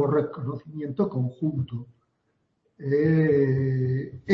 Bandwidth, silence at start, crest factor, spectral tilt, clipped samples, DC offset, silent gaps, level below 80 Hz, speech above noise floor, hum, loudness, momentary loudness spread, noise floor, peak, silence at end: 5.6 kHz; 0 s; 18 dB; -10.5 dB/octave; under 0.1%; under 0.1%; none; -60 dBFS; 48 dB; none; -26 LUFS; 13 LU; -73 dBFS; -8 dBFS; 0 s